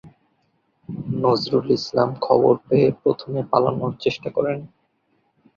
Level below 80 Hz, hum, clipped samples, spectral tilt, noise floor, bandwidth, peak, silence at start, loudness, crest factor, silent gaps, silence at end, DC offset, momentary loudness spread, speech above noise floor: -58 dBFS; none; under 0.1%; -7.5 dB/octave; -67 dBFS; 7.2 kHz; -2 dBFS; 0.05 s; -21 LUFS; 20 dB; none; 0.9 s; under 0.1%; 9 LU; 47 dB